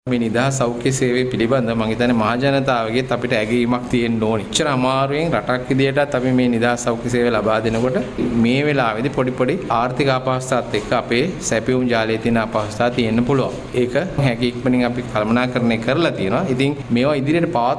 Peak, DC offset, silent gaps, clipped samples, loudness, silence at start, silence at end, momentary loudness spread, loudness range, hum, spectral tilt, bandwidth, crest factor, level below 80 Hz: -2 dBFS; under 0.1%; none; under 0.1%; -18 LUFS; 0.05 s; 0 s; 3 LU; 1 LU; none; -5.5 dB/octave; 11 kHz; 14 dB; -42 dBFS